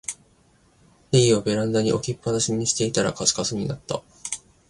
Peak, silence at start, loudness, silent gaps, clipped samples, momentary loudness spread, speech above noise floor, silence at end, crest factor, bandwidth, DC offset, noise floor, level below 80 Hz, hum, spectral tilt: -4 dBFS; 0.1 s; -23 LUFS; none; under 0.1%; 13 LU; 36 dB; 0.35 s; 20 dB; 11.5 kHz; under 0.1%; -59 dBFS; -54 dBFS; none; -4 dB/octave